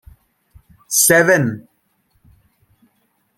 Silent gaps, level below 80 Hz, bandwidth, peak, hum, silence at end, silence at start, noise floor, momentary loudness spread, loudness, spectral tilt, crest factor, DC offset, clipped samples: none; -54 dBFS; 16.5 kHz; -2 dBFS; none; 1.8 s; 0.9 s; -64 dBFS; 14 LU; -13 LUFS; -3 dB/octave; 20 dB; under 0.1%; under 0.1%